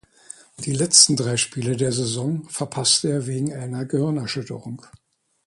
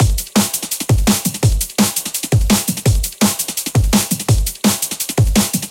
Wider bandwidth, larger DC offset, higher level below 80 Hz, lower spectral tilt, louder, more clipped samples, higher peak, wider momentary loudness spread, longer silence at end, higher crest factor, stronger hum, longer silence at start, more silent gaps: second, 11.5 kHz vs 17.5 kHz; neither; second, -60 dBFS vs -22 dBFS; about the same, -3 dB/octave vs -4 dB/octave; second, -20 LUFS vs -16 LUFS; neither; about the same, 0 dBFS vs 0 dBFS; first, 19 LU vs 3 LU; first, 0.7 s vs 0 s; first, 22 dB vs 16 dB; neither; first, 0.6 s vs 0 s; neither